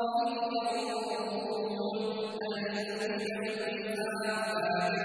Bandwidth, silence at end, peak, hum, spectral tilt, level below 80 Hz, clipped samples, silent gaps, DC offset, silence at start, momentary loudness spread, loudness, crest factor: 11 kHz; 0 s; -20 dBFS; none; -4.5 dB/octave; -76 dBFS; under 0.1%; none; under 0.1%; 0 s; 4 LU; -33 LUFS; 14 dB